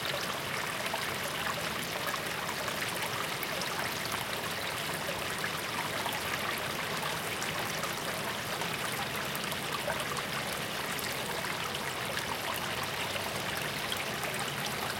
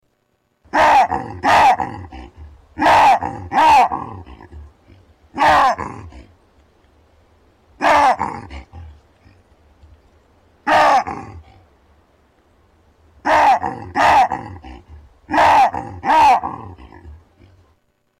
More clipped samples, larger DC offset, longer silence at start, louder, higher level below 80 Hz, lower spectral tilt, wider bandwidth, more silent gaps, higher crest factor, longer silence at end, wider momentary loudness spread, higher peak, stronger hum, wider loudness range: neither; neither; second, 0 s vs 0.75 s; second, -33 LUFS vs -15 LUFS; second, -62 dBFS vs -44 dBFS; second, -2.5 dB/octave vs -4 dB/octave; about the same, 17 kHz vs 16.5 kHz; neither; first, 18 dB vs 12 dB; second, 0 s vs 1.1 s; second, 1 LU vs 22 LU; second, -16 dBFS vs -6 dBFS; neither; second, 0 LU vs 6 LU